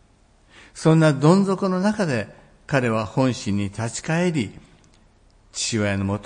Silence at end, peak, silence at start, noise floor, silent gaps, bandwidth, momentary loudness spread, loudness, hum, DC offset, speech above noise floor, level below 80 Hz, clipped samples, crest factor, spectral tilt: 0 s; -2 dBFS; 0.75 s; -56 dBFS; none; 10.5 kHz; 11 LU; -21 LUFS; none; under 0.1%; 36 dB; -56 dBFS; under 0.1%; 20 dB; -6 dB/octave